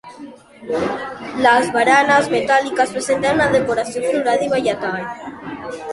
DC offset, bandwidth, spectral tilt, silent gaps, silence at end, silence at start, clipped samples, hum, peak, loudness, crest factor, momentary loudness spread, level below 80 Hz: under 0.1%; 11.5 kHz; -4 dB/octave; none; 0 s; 0.05 s; under 0.1%; none; -2 dBFS; -17 LUFS; 16 dB; 16 LU; -52 dBFS